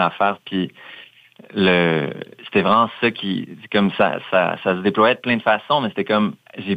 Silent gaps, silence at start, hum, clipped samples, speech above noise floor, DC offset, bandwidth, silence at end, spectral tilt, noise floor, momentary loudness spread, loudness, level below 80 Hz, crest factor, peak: none; 0 s; none; under 0.1%; 27 dB; under 0.1%; 8.2 kHz; 0 s; -7.5 dB/octave; -46 dBFS; 12 LU; -19 LUFS; -62 dBFS; 18 dB; -2 dBFS